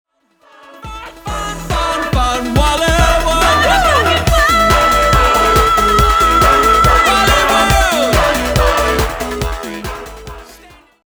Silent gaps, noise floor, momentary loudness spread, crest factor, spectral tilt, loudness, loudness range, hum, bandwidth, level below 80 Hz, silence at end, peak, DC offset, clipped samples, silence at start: none; -50 dBFS; 15 LU; 12 dB; -4 dB/octave; -11 LUFS; 6 LU; none; over 20 kHz; -20 dBFS; 0.55 s; 0 dBFS; under 0.1%; under 0.1%; 0.7 s